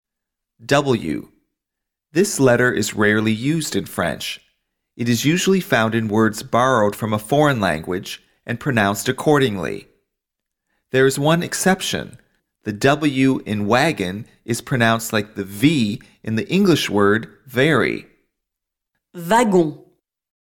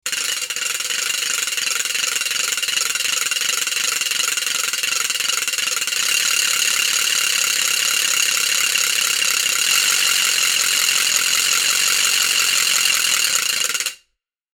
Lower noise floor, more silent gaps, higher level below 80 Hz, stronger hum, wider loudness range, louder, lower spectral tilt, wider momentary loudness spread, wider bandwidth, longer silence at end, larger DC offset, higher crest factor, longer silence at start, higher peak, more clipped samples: first, -83 dBFS vs -71 dBFS; neither; first, -52 dBFS vs -64 dBFS; neither; about the same, 2 LU vs 4 LU; second, -19 LUFS vs -16 LUFS; first, -5 dB/octave vs 3.5 dB/octave; first, 12 LU vs 5 LU; second, 18 kHz vs over 20 kHz; about the same, 0.7 s vs 0.6 s; neither; about the same, 16 dB vs 20 dB; first, 0.6 s vs 0.05 s; second, -4 dBFS vs 0 dBFS; neither